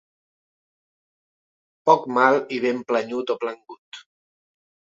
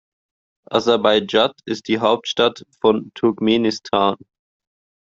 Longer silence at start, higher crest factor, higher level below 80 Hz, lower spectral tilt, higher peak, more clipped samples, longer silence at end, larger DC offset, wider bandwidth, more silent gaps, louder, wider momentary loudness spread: first, 1.85 s vs 0.7 s; first, 24 dB vs 18 dB; second, -76 dBFS vs -58 dBFS; about the same, -5 dB/octave vs -5 dB/octave; about the same, 0 dBFS vs -2 dBFS; neither; about the same, 0.9 s vs 0.85 s; neither; about the same, 7.8 kHz vs 7.6 kHz; first, 3.78-3.92 s vs none; second, -22 LUFS vs -19 LUFS; first, 23 LU vs 6 LU